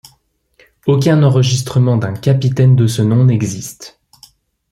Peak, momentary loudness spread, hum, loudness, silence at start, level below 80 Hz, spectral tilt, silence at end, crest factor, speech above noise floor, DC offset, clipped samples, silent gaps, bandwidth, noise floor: -2 dBFS; 11 LU; none; -13 LUFS; 0.85 s; -48 dBFS; -6.5 dB/octave; 0.85 s; 12 dB; 45 dB; under 0.1%; under 0.1%; none; 13 kHz; -57 dBFS